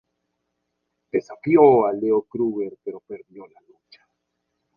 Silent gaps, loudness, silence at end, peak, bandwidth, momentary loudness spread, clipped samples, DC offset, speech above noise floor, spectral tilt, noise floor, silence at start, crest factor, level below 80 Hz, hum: none; -20 LUFS; 1.3 s; -2 dBFS; 6.8 kHz; 23 LU; under 0.1%; under 0.1%; 56 dB; -9.5 dB/octave; -77 dBFS; 1.15 s; 22 dB; -64 dBFS; none